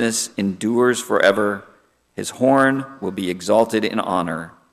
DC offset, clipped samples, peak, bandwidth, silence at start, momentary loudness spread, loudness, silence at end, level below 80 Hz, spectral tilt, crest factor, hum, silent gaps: under 0.1%; under 0.1%; -2 dBFS; 15 kHz; 0 s; 14 LU; -19 LUFS; 0.2 s; -62 dBFS; -4 dB/octave; 16 dB; none; none